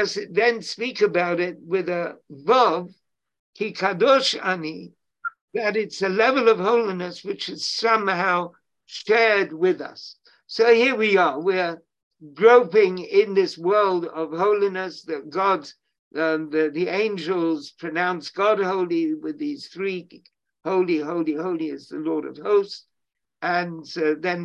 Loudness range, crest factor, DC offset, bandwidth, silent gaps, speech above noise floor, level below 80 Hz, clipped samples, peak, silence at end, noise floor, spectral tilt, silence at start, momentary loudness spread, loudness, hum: 6 LU; 20 dB; under 0.1%; 9.2 kHz; 3.39-3.53 s, 5.41-5.48 s, 12.03-12.11 s, 15.99-16.11 s; 61 dB; -74 dBFS; under 0.1%; -2 dBFS; 0 s; -83 dBFS; -5 dB/octave; 0 s; 13 LU; -22 LUFS; none